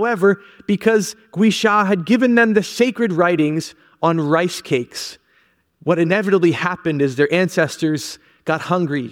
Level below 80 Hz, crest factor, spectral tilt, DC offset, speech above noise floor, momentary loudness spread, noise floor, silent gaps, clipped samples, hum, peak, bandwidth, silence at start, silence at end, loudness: -64 dBFS; 16 dB; -5.5 dB/octave; under 0.1%; 42 dB; 11 LU; -59 dBFS; none; under 0.1%; none; -2 dBFS; 16.5 kHz; 0 s; 0 s; -18 LUFS